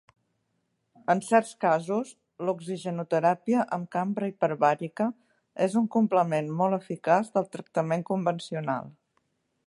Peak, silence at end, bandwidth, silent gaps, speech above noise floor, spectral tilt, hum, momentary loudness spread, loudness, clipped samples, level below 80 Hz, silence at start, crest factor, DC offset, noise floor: -8 dBFS; 0.75 s; 11.5 kHz; none; 50 dB; -6.5 dB/octave; none; 9 LU; -27 LUFS; under 0.1%; -78 dBFS; 1.1 s; 20 dB; under 0.1%; -76 dBFS